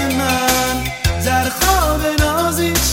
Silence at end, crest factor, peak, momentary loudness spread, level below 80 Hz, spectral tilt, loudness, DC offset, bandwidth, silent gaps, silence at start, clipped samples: 0 s; 14 dB; -2 dBFS; 4 LU; -26 dBFS; -3.5 dB/octave; -16 LUFS; 0.1%; 16.5 kHz; none; 0 s; under 0.1%